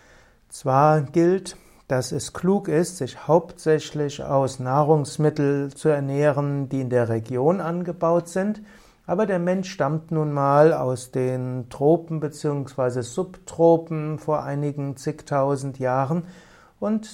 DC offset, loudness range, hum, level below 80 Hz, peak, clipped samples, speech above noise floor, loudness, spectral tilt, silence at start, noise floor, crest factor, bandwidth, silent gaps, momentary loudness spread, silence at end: under 0.1%; 2 LU; none; -58 dBFS; -4 dBFS; under 0.1%; 31 dB; -23 LUFS; -7 dB/octave; 0.5 s; -53 dBFS; 18 dB; 14.5 kHz; none; 10 LU; 0 s